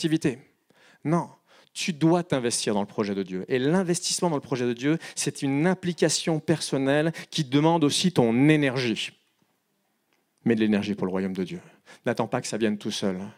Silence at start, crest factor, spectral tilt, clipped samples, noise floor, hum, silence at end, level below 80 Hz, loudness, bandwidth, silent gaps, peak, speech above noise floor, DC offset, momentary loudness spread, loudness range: 0 s; 20 dB; -5 dB/octave; under 0.1%; -73 dBFS; none; 0.05 s; -70 dBFS; -25 LUFS; 16 kHz; none; -6 dBFS; 48 dB; under 0.1%; 9 LU; 5 LU